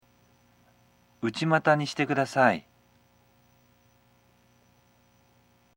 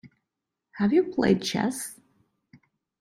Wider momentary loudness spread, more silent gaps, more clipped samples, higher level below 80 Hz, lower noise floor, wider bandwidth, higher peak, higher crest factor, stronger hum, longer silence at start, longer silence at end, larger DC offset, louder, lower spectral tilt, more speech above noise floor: about the same, 11 LU vs 11 LU; neither; neither; second, -72 dBFS vs -62 dBFS; second, -63 dBFS vs -85 dBFS; about the same, 16.5 kHz vs 16 kHz; about the same, -6 dBFS vs -8 dBFS; first, 26 dB vs 20 dB; first, 60 Hz at -60 dBFS vs none; first, 1.2 s vs 0.05 s; first, 3.15 s vs 1.05 s; neither; about the same, -26 LUFS vs -25 LUFS; about the same, -5.5 dB/octave vs -5 dB/octave; second, 39 dB vs 61 dB